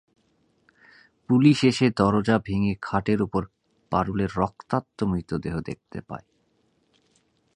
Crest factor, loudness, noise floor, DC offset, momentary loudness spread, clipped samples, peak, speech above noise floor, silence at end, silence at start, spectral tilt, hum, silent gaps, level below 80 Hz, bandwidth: 22 dB; -24 LUFS; -68 dBFS; under 0.1%; 18 LU; under 0.1%; -4 dBFS; 44 dB; 1.4 s; 1.3 s; -7 dB/octave; none; none; -48 dBFS; 11 kHz